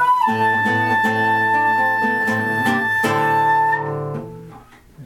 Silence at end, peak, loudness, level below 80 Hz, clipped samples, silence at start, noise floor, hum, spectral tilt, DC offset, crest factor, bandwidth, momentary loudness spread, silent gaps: 0 s; -6 dBFS; -17 LUFS; -56 dBFS; under 0.1%; 0 s; -43 dBFS; none; -5.5 dB/octave; under 0.1%; 12 dB; 17.5 kHz; 8 LU; none